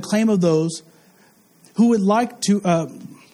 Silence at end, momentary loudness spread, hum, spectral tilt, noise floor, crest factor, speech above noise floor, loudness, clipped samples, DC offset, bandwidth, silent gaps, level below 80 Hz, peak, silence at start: 0.2 s; 15 LU; none; -6 dB/octave; -54 dBFS; 14 dB; 36 dB; -19 LUFS; under 0.1%; under 0.1%; 13 kHz; none; -64 dBFS; -6 dBFS; 0 s